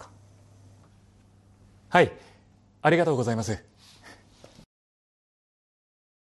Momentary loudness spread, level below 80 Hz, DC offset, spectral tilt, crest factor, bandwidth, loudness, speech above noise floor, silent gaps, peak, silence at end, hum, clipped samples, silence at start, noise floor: 10 LU; -62 dBFS; under 0.1%; -6 dB/octave; 26 dB; 12 kHz; -25 LUFS; 35 dB; none; -4 dBFS; 2.7 s; none; under 0.1%; 0 s; -58 dBFS